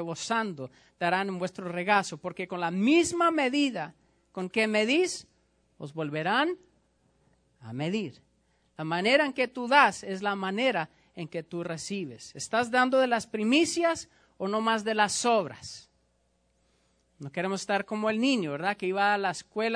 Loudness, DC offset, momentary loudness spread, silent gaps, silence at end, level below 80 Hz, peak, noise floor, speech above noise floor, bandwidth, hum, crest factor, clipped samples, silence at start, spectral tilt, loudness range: -28 LUFS; under 0.1%; 16 LU; none; 0 s; -70 dBFS; -6 dBFS; -71 dBFS; 43 dB; 10.5 kHz; none; 22 dB; under 0.1%; 0 s; -4 dB/octave; 5 LU